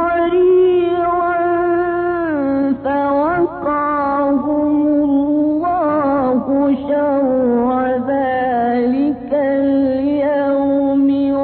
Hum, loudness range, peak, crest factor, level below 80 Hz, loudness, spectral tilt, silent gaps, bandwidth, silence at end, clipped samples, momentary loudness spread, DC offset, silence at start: none; 1 LU; -6 dBFS; 10 dB; -46 dBFS; -16 LUFS; -11 dB/octave; none; 4.5 kHz; 0 s; under 0.1%; 3 LU; under 0.1%; 0 s